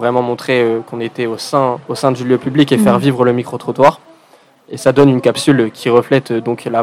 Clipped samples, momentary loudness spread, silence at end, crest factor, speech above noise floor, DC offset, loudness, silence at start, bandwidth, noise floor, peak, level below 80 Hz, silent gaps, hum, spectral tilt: 0.5%; 9 LU; 0 s; 14 dB; 35 dB; under 0.1%; -14 LUFS; 0 s; 15.5 kHz; -48 dBFS; 0 dBFS; -54 dBFS; none; none; -6 dB/octave